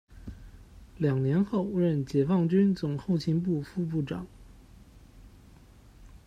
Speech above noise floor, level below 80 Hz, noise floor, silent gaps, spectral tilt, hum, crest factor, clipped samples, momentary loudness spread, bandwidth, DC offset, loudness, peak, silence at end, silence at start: 27 dB; -54 dBFS; -54 dBFS; none; -9 dB/octave; none; 16 dB; under 0.1%; 16 LU; 9.4 kHz; under 0.1%; -28 LUFS; -14 dBFS; 0.1 s; 0.1 s